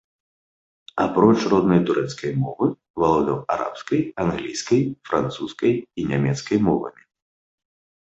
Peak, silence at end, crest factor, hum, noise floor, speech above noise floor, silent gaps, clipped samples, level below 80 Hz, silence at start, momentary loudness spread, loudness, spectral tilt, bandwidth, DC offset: 0 dBFS; 1.2 s; 22 dB; none; under -90 dBFS; over 69 dB; 2.90-2.94 s; under 0.1%; -52 dBFS; 0.95 s; 8 LU; -22 LUFS; -6.5 dB/octave; 8.2 kHz; under 0.1%